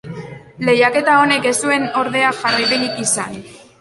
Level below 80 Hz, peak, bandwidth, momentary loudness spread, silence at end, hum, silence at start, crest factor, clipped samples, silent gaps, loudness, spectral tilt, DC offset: -56 dBFS; -2 dBFS; 12 kHz; 18 LU; 0.2 s; none; 0.05 s; 16 dB; under 0.1%; none; -15 LUFS; -2.5 dB/octave; under 0.1%